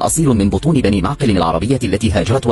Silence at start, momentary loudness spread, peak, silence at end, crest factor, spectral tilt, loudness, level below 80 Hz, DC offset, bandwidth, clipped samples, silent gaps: 0 s; 2 LU; -2 dBFS; 0 s; 12 dB; -6 dB/octave; -15 LUFS; -30 dBFS; under 0.1%; 13.5 kHz; under 0.1%; none